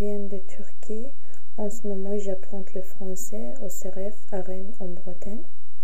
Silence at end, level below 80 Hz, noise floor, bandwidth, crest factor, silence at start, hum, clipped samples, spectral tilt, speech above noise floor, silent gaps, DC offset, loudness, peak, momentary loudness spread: 0.05 s; -56 dBFS; -55 dBFS; 16 kHz; 16 dB; 0 s; none; under 0.1%; -7 dB/octave; 20 dB; none; 20%; -35 LUFS; -10 dBFS; 11 LU